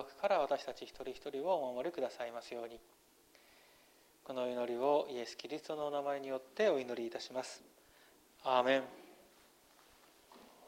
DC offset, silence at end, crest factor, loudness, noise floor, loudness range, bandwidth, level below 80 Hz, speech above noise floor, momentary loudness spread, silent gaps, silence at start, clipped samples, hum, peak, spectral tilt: under 0.1%; 0 s; 22 dB; -38 LUFS; -67 dBFS; 5 LU; 16 kHz; -78 dBFS; 29 dB; 14 LU; none; 0 s; under 0.1%; none; -16 dBFS; -4 dB/octave